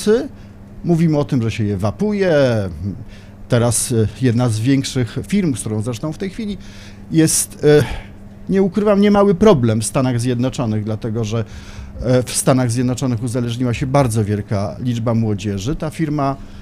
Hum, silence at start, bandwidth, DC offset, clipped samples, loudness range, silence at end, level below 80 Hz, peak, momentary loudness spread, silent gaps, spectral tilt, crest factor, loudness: none; 0 s; 15.5 kHz; under 0.1%; under 0.1%; 4 LU; 0 s; -38 dBFS; -2 dBFS; 14 LU; none; -6 dB/octave; 16 dB; -17 LUFS